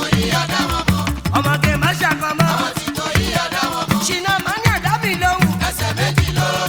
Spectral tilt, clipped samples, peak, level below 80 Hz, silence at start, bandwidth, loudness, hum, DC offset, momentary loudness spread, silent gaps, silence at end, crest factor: -4.5 dB/octave; under 0.1%; 0 dBFS; -32 dBFS; 0 s; 19.5 kHz; -17 LUFS; none; under 0.1%; 3 LU; none; 0 s; 18 dB